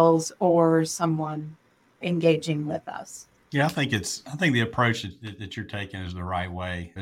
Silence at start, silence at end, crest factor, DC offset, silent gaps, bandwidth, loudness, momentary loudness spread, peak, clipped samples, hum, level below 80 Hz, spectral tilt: 0 s; 0 s; 18 dB; under 0.1%; none; 16 kHz; -26 LUFS; 16 LU; -8 dBFS; under 0.1%; none; -56 dBFS; -5.5 dB/octave